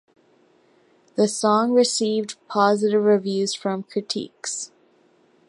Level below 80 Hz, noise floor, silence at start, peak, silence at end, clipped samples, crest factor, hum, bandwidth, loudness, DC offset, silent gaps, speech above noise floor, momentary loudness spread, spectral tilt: -76 dBFS; -59 dBFS; 1.15 s; -4 dBFS; 0.85 s; under 0.1%; 18 dB; none; 11.5 kHz; -22 LUFS; under 0.1%; none; 38 dB; 11 LU; -4 dB/octave